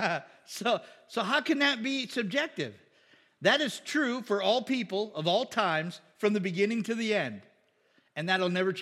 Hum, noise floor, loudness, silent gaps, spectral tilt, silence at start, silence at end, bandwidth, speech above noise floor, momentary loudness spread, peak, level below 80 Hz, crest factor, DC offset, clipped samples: none; -68 dBFS; -29 LUFS; none; -4.5 dB/octave; 0 s; 0 s; 15.5 kHz; 39 dB; 11 LU; -8 dBFS; -88 dBFS; 22 dB; under 0.1%; under 0.1%